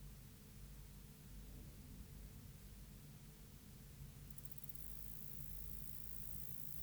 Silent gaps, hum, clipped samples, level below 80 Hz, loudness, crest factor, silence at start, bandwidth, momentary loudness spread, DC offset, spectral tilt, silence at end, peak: none; none; under 0.1%; -60 dBFS; -51 LUFS; 22 dB; 0 s; over 20 kHz; 13 LU; under 0.1%; -4.5 dB/octave; 0 s; -30 dBFS